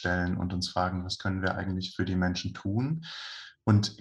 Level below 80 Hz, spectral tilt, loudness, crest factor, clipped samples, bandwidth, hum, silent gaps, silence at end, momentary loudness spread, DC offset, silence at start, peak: -54 dBFS; -6 dB/octave; -30 LUFS; 20 dB; under 0.1%; 11 kHz; none; none; 0.05 s; 8 LU; under 0.1%; 0 s; -10 dBFS